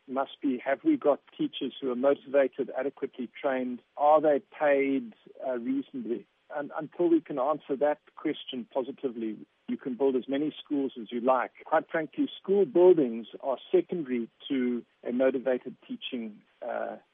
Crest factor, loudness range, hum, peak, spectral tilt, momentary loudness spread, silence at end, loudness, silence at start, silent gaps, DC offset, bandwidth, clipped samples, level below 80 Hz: 18 dB; 5 LU; none; -10 dBFS; -4 dB/octave; 12 LU; 0.15 s; -29 LUFS; 0.1 s; none; under 0.1%; 3.8 kHz; under 0.1%; -88 dBFS